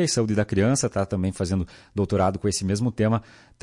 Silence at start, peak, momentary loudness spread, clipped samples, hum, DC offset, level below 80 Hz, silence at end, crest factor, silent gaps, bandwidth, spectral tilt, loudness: 0 s; -12 dBFS; 6 LU; under 0.1%; none; under 0.1%; -50 dBFS; 0.4 s; 12 dB; none; 11.5 kHz; -5.5 dB/octave; -24 LUFS